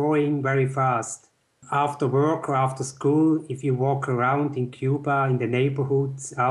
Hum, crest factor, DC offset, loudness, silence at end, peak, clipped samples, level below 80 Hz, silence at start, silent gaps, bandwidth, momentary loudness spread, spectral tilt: none; 12 dB; under 0.1%; -24 LUFS; 0 s; -10 dBFS; under 0.1%; -70 dBFS; 0 s; none; 11.5 kHz; 6 LU; -7 dB/octave